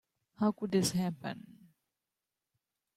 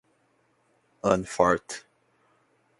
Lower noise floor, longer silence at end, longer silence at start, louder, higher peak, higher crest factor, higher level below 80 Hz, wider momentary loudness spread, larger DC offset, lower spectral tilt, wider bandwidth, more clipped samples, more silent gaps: first, -90 dBFS vs -68 dBFS; first, 1.45 s vs 1 s; second, 0.4 s vs 1.05 s; second, -33 LUFS vs -25 LUFS; second, -18 dBFS vs -6 dBFS; second, 18 dB vs 24 dB; second, -72 dBFS vs -58 dBFS; second, 13 LU vs 17 LU; neither; about the same, -5 dB/octave vs -5 dB/octave; first, 16 kHz vs 11.5 kHz; neither; neither